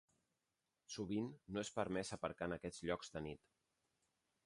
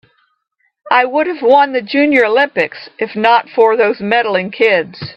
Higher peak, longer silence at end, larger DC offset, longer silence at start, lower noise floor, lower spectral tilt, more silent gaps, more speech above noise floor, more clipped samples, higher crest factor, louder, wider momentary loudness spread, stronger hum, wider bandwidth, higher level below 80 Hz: second, -26 dBFS vs 0 dBFS; first, 1.1 s vs 0.05 s; neither; about the same, 0.9 s vs 0.85 s; first, -90 dBFS vs -64 dBFS; second, -5 dB/octave vs -6.5 dB/octave; neither; second, 45 dB vs 51 dB; neither; first, 22 dB vs 14 dB; second, -46 LUFS vs -13 LUFS; about the same, 8 LU vs 6 LU; neither; first, 11.5 kHz vs 6.6 kHz; second, -70 dBFS vs -62 dBFS